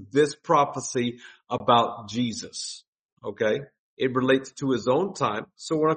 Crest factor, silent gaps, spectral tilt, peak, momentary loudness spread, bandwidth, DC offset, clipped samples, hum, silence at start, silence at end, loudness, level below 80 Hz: 22 dB; 2.88-3.17 s, 3.79-3.97 s; -4.5 dB/octave; -4 dBFS; 12 LU; 8.8 kHz; under 0.1%; under 0.1%; none; 0 s; 0 s; -25 LUFS; -68 dBFS